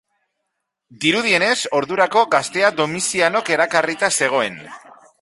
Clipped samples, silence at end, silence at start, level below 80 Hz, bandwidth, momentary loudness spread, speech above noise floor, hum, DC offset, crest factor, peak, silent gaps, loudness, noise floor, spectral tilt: under 0.1%; 0.45 s; 0.9 s; -62 dBFS; 11.5 kHz; 5 LU; 58 dB; none; under 0.1%; 18 dB; 0 dBFS; none; -17 LUFS; -77 dBFS; -2.5 dB/octave